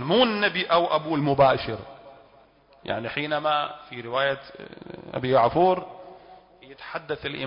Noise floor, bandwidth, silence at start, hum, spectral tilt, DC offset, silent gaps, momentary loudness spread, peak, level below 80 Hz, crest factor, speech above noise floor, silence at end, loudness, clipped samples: -56 dBFS; 5.4 kHz; 0 s; none; -10 dB/octave; under 0.1%; none; 22 LU; -8 dBFS; -56 dBFS; 18 dB; 32 dB; 0 s; -24 LUFS; under 0.1%